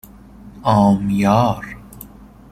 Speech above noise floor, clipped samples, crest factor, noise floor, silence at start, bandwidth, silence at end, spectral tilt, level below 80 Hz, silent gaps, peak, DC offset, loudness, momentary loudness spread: 26 dB; under 0.1%; 16 dB; -41 dBFS; 0.45 s; 15.5 kHz; 0.45 s; -7.5 dB/octave; -44 dBFS; none; -2 dBFS; under 0.1%; -16 LUFS; 23 LU